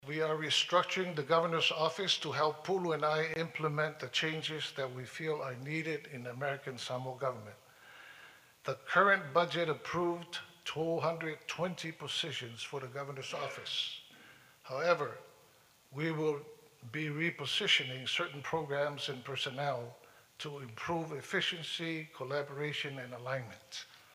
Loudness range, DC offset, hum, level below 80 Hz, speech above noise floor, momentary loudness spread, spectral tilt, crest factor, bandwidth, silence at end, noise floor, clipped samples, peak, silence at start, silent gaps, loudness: 6 LU; under 0.1%; none; -78 dBFS; 29 dB; 14 LU; -4 dB/octave; 24 dB; 15.5 kHz; 0.1 s; -65 dBFS; under 0.1%; -14 dBFS; 0.05 s; none; -35 LUFS